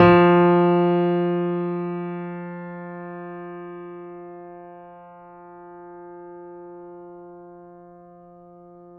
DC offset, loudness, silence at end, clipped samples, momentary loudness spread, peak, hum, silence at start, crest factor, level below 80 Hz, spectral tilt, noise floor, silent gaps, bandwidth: under 0.1%; -20 LUFS; 1.5 s; under 0.1%; 27 LU; -2 dBFS; none; 0 s; 22 dB; -58 dBFS; -10 dB/octave; -47 dBFS; none; 4.7 kHz